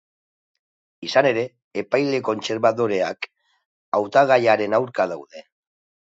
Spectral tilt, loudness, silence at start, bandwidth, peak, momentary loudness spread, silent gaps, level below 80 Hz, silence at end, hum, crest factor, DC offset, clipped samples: -5 dB/octave; -21 LUFS; 1 s; 7.8 kHz; -2 dBFS; 15 LU; 1.64-1.71 s, 3.66-3.92 s; -70 dBFS; 0.7 s; none; 20 dB; under 0.1%; under 0.1%